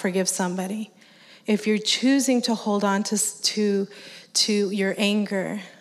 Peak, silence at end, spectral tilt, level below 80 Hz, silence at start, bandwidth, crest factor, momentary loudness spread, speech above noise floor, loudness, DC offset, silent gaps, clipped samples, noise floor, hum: -8 dBFS; 0.1 s; -3.5 dB/octave; -86 dBFS; 0 s; 15.5 kHz; 16 dB; 11 LU; 28 dB; -23 LUFS; under 0.1%; none; under 0.1%; -51 dBFS; none